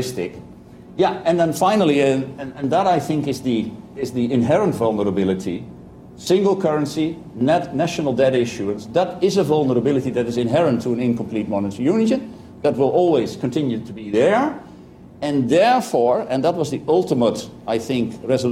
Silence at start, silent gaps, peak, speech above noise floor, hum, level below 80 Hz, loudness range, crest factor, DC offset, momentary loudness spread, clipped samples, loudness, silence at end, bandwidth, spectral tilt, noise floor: 0 s; none; -6 dBFS; 23 dB; none; -54 dBFS; 2 LU; 14 dB; under 0.1%; 10 LU; under 0.1%; -19 LUFS; 0 s; 15.5 kHz; -6.5 dB/octave; -42 dBFS